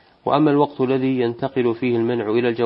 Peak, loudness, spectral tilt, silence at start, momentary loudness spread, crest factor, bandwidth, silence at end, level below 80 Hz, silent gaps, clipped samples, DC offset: -2 dBFS; -20 LUFS; -11.5 dB/octave; 0.25 s; 5 LU; 16 dB; 5.6 kHz; 0 s; -64 dBFS; none; under 0.1%; under 0.1%